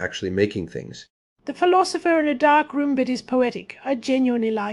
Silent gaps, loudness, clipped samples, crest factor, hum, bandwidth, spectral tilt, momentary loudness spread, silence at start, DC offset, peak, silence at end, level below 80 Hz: 1.10-1.36 s; -21 LUFS; under 0.1%; 16 dB; none; 11.5 kHz; -5 dB/octave; 15 LU; 0 s; under 0.1%; -6 dBFS; 0 s; -60 dBFS